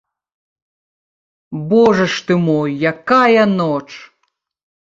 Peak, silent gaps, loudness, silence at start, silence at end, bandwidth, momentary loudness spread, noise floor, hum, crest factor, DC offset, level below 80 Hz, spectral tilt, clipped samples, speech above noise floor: -2 dBFS; none; -14 LUFS; 1.5 s; 0.9 s; 7.8 kHz; 14 LU; -69 dBFS; none; 16 dB; under 0.1%; -56 dBFS; -6.5 dB/octave; under 0.1%; 55 dB